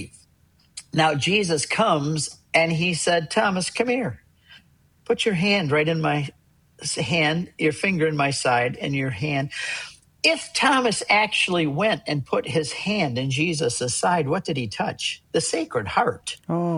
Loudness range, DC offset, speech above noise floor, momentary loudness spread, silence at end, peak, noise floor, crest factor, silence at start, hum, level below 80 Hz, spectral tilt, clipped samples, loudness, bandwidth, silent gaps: 3 LU; under 0.1%; 37 dB; 8 LU; 0 s; -4 dBFS; -60 dBFS; 20 dB; 0 s; none; -58 dBFS; -4 dB/octave; under 0.1%; -22 LUFS; 12.5 kHz; none